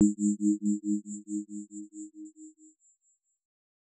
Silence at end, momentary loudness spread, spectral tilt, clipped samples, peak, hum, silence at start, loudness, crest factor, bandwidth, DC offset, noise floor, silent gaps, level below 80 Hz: 1.5 s; 21 LU; -10 dB/octave; under 0.1%; -12 dBFS; none; 0 s; -31 LUFS; 22 dB; 9 kHz; under 0.1%; -74 dBFS; none; -80 dBFS